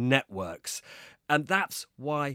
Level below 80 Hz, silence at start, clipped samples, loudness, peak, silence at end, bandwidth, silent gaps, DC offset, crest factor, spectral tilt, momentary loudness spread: -68 dBFS; 0 s; under 0.1%; -30 LUFS; -6 dBFS; 0 s; 16.5 kHz; none; under 0.1%; 24 dB; -4 dB/octave; 14 LU